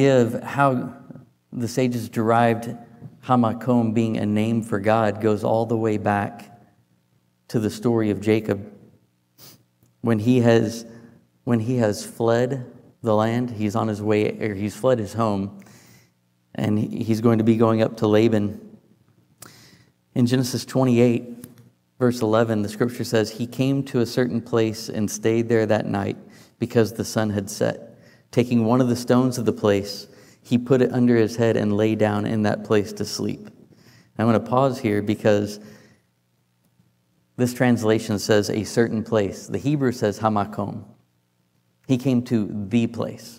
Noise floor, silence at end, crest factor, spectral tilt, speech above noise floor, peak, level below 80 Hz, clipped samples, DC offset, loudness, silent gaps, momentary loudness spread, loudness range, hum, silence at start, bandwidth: -67 dBFS; 0.05 s; 18 dB; -6.5 dB/octave; 46 dB; -4 dBFS; -64 dBFS; under 0.1%; under 0.1%; -22 LUFS; none; 11 LU; 4 LU; none; 0 s; 16 kHz